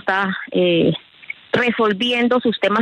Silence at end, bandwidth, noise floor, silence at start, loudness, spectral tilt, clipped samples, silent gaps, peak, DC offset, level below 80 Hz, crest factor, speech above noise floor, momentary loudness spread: 0 s; 9.8 kHz; -37 dBFS; 0.05 s; -18 LUFS; -6.5 dB/octave; under 0.1%; none; -4 dBFS; under 0.1%; -62 dBFS; 14 dB; 20 dB; 10 LU